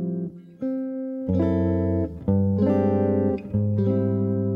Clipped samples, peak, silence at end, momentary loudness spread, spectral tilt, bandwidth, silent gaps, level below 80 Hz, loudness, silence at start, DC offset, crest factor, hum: under 0.1%; -10 dBFS; 0 s; 9 LU; -12 dB/octave; 3.9 kHz; none; -48 dBFS; -24 LUFS; 0 s; under 0.1%; 14 dB; none